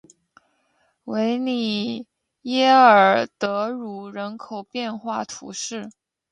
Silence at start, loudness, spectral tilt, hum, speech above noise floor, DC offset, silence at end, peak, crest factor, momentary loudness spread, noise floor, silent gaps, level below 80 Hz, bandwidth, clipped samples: 1.05 s; -21 LUFS; -4 dB/octave; none; 46 dB; under 0.1%; 0.4 s; -2 dBFS; 20 dB; 21 LU; -67 dBFS; none; -72 dBFS; 10.5 kHz; under 0.1%